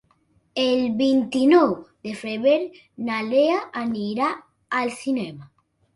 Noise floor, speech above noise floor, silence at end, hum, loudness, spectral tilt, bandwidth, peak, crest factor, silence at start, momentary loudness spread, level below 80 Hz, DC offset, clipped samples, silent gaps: -63 dBFS; 42 dB; 0.5 s; none; -22 LUFS; -5.5 dB/octave; 11.5 kHz; -4 dBFS; 18 dB; 0.55 s; 15 LU; -66 dBFS; under 0.1%; under 0.1%; none